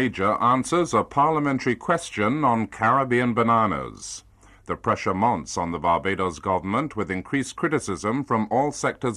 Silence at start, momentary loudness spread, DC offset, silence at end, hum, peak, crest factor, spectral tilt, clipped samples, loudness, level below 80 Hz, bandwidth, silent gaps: 0 s; 8 LU; under 0.1%; 0 s; none; -8 dBFS; 16 dB; -5.5 dB/octave; under 0.1%; -23 LUFS; -52 dBFS; 12 kHz; none